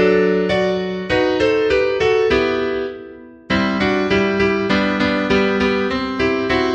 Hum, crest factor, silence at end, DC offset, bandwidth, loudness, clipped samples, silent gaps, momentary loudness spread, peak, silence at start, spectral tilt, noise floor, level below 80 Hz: none; 14 dB; 0 s; under 0.1%; 8.6 kHz; -17 LUFS; under 0.1%; none; 6 LU; -2 dBFS; 0 s; -6 dB/octave; -37 dBFS; -40 dBFS